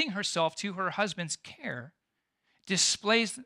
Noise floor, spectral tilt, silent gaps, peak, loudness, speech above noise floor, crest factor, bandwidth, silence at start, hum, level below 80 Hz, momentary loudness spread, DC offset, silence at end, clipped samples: -82 dBFS; -2 dB/octave; none; -12 dBFS; -29 LUFS; 51 dB; 20 dB; 15 kHz; 0 s; none; -76 dBFS; 13 LU; under 0.1%; 0 s; under 0.1%